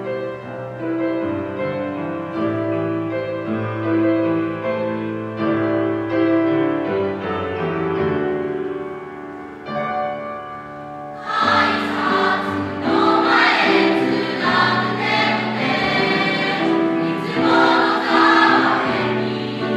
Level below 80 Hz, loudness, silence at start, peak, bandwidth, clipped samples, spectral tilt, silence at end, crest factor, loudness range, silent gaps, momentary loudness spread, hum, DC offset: -58 dBFS; -19 LUFS; 0 s; -2 dBFS; 8.8 kHz; under 0.1%; -6 dB/octave; 0 s; 18 dB; 7 LU; none; 14 LU; none; under 0.1%